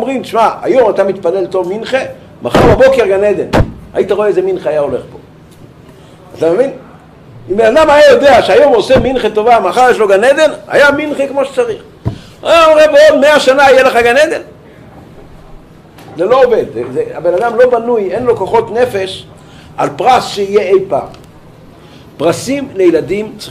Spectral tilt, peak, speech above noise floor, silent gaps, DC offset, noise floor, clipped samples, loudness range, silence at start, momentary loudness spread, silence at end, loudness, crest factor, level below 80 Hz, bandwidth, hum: -5 dB/octave; 0 dBFS; 27 dB; none; under 0.1%; -36 dBFS; under 0.1%; 7 LU; 0 s; 12 LU; 0 s; -10 LUFS; 10 dB; -34 dBFS; 15 kHz; none